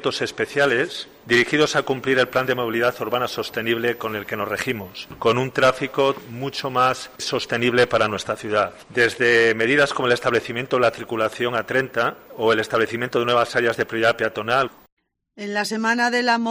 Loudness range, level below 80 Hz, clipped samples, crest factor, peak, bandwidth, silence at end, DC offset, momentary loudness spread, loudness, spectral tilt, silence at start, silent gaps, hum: 3 LU; -58 dBFS; under 0.1%; 16 dB; -6 dBFS; 15.5 kHz; 0 s; under 0.1%; 8 LU; -21 LUFS; -4 dB/octave; 0 s; 14.92-14.97 s; none